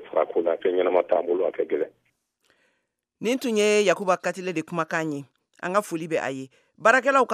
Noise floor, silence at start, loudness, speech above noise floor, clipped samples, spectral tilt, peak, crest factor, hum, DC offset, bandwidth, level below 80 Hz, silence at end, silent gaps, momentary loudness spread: -76 dBFS; 0 s; -24 LUFS; 52 dB; under 0.1%; -4 dB/octave; -4 dBFS; 22 dB; none; under 0.1%; 15 kHz; -80 dBFS; 0 s; none; 12 LU